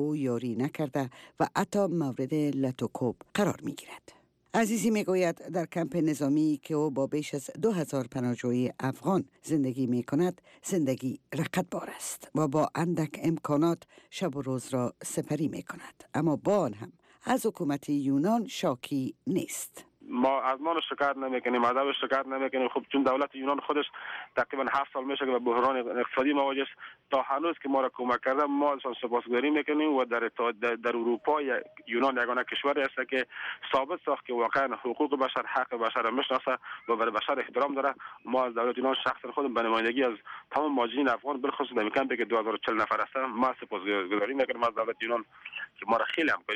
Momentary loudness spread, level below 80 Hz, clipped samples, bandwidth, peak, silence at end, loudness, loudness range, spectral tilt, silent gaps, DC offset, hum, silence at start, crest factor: 7 LU; -72 dBFS; under 0.1%; 15.5 kHz; -16 dBFS; 0 s; -30 LUFS; 2 LU; -5.5 dB/octave; none; under 0.1%; none; 0 s; 14 dB